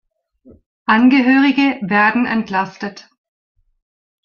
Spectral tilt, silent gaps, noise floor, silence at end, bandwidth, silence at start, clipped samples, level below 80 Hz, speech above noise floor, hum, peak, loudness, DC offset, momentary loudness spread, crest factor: -6 dB/octave; none; -49 dBFS; 1.25 s; 6.8 kHz; 0.9 s; under 0.1%; -60 dBFS; 35 dB; none; -2 dBFS; -14 LUFS; under 0.1%; 14 LU; 16 dB